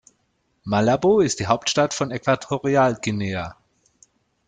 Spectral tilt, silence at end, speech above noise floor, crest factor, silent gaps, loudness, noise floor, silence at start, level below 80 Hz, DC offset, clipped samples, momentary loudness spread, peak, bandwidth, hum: -5 dB/octave; 0.95 s; 48 dB; 18 dB; none; -21 LUFS; -69 dBFS; 0.65 s; -56 dBFS; under 0.1%; under 0.1%; 10 LU; -4 dBFS; 9.6 kHz; none